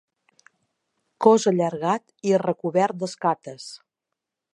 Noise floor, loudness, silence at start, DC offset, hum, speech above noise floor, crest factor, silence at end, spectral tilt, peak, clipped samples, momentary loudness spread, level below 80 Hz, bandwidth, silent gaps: -84 dBFS; -22 LUFS; 1.2 s; under 0.1%; none; 62 dB; 22 dB; 0.8 s; -5.5 dB/octave; -2 dBFS; under 0.1%; 15 LU; -76 dBFS; 11 kHz; none